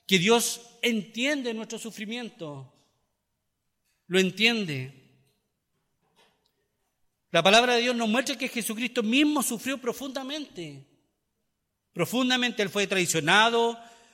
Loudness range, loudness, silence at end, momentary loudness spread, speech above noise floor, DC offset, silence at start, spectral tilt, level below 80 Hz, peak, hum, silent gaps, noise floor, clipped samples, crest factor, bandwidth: 7 LU; -25 LUFS; 0.25 s; 18 LU; 54 dB; under 0.1%; 0.1 s; -3 dB/octave; -72 dBFS; -6 dBFS; none; none; -79 dBFS; under 0.1%; 22 dB; 16.5 kHz